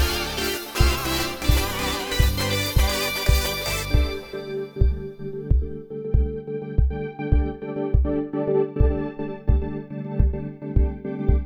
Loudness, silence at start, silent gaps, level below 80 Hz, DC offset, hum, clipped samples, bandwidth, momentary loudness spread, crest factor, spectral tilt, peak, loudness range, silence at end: -24 LUFS; 0 s; none; -26 dBFS; under 0.1%; none; under 0.1%; over 20 kHz; 10 LU; 18 dB; -5 dB/octave; -4 dBFS; 4 LU; 0 s